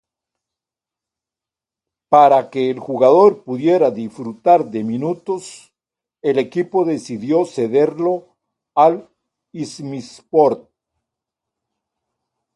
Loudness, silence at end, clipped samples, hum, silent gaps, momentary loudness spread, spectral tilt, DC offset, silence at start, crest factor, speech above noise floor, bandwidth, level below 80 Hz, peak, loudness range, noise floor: -16 LUFS; 2 s; under 0.1%; none; none; 16 LU; -6.5 dB/octave; under 0.1%; 2.1 s; 18 dB; 72 dB; 11.5 kHz; -68 dBFS; 0 dBFS; 6 LU; -88 dBFS